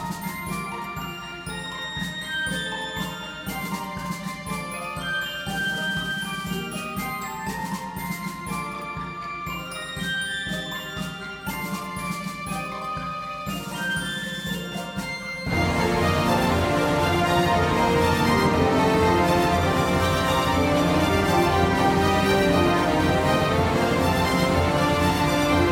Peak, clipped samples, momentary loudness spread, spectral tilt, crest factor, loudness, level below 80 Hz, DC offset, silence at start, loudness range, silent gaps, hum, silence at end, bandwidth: -8 dBFS; under 0.1%; 11 LU; -5 dB/octave; 16 dB; -24 LUFS; -40 dBFS; under 0.1%; 0 s; 9 LU; none; none; 0 s; over 20 kHz